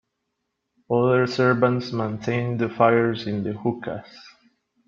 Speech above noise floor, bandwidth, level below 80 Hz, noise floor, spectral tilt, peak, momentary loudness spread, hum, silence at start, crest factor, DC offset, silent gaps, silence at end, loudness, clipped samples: 56 dB; 7.4 kHz; -62 dBFS; -78 dBFS; -7.5 dB/octave; -4 dBFS; 9 LU; none; 0.9 s; 20 dB; under 0.1%; none; 0.6 s; -22 LUFS; under 0.1%